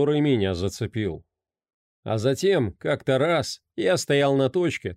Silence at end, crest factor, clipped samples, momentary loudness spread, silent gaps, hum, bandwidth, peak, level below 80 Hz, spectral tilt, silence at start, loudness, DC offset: 0 s; 12 dB; under 0.1%; 9 LU; 1.74-2.03 s; none; 15.5 kHz; -10 dBFS; -54 dBFS; -5.5 dB/octave; 0 s; -24 LUFS; under 0.1%